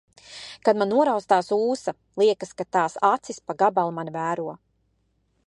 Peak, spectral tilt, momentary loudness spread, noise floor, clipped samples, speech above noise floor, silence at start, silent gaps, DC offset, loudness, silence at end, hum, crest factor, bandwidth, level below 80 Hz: -4 dBFS; -5 dB/octave; 13 LU; -69 dBFS; under 0.1%; 46 dB; 0.3 s; none; under 0.1%; -23 LUFS; 0.9 s; none; 20 dB; 11 kHz; -70 dBFS